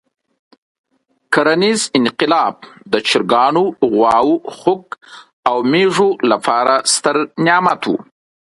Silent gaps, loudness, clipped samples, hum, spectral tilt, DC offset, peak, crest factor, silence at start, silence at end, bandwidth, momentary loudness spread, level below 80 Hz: 5.33-5.43 s; -14 LUFS; under 0.1%; none; -3.5 dB/octave; under 0.1%; 0 dBFS; 16 dB; 1.3 s; 0.45 s; 11.5 kHz; 8 LU; -60 dBFS